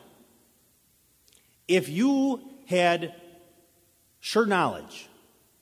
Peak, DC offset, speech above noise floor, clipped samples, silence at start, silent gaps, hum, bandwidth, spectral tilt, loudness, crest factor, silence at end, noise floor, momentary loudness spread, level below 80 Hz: -8 dBFS; under 0.1%; 39 dB; under 0.1%; 1.7 s; none; none; 16 kHz; -5 dB/octave; -26 LUFS; 20 dB; 0.6 s; -64 dBFS; 17 LU; -70 dBFS